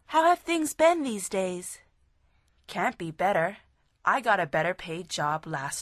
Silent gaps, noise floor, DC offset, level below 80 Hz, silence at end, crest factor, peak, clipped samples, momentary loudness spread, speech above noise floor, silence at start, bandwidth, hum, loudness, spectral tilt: none; -66 dBFS; under 0.1%; -64 dBFS; 0 s; 18 dB; -10 dBFS; under 0.1%; 11 LU; 39 dB; 0.1 s; 13.5 kHz; none; -27 LUFS; -4 dB/octave